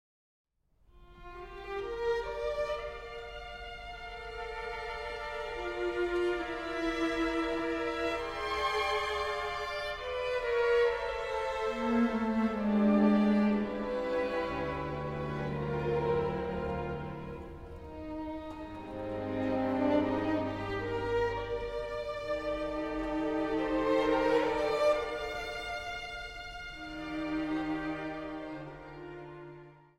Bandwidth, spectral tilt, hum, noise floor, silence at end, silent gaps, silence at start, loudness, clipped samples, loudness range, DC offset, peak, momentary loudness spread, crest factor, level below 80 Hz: 13 kHz; -6.5 dB/octave; none; -66 dBFS; 0.2 s; none; 0.95 s; -33 LUFS; under 0.1%; 9 LU; under 0.1%; -16 dBFS; 15 LU; 18 dB; -52 dBFS